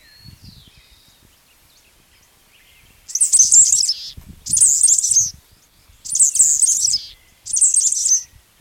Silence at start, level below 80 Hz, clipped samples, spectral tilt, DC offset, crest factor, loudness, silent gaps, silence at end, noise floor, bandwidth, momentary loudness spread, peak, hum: 3.1 s; -52 dBFS; under 0.1%; 2.5 dB/octave; under 0.1%; 16 dB; -12 LUFS; none; 0.35 s; -53 dBFS; 18 kHz; 14 LU; -2 dBFS; none